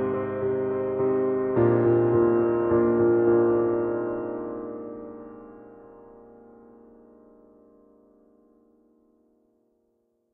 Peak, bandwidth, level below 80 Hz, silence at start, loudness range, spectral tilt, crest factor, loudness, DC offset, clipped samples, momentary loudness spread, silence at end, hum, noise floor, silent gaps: -10 dBFS; 2.9 kHz; -58 dBFS; 0 s; 19 LU; -10 dB/octave; 16 dB; -24 LUFS; under 0.1%; under 0.1%; 19 LU; 4.35 s; none; -71 dBFS; none